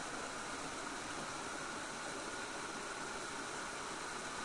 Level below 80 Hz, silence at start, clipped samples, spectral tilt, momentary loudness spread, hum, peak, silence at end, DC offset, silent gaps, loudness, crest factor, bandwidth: -66 dBFS; 0 s; under 0.1%; -2 dB/octave; 0 LU; none; -30 dBFS; 0 s; under 0.1%; none; -43 LUFS; 14 dB; 11.5 kHz